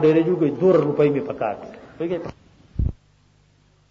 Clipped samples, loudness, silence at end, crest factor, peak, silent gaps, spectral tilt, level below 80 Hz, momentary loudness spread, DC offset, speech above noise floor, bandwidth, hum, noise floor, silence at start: under 0.1%; -21 LUFS; 1 s; 14 dB; -6 dBFS; none; -9.5 dB/octave; -38 dBFS; 17 LU; under 0.1%; 38 dB; 7.2 kHz; none; -58 dBFS; 0 s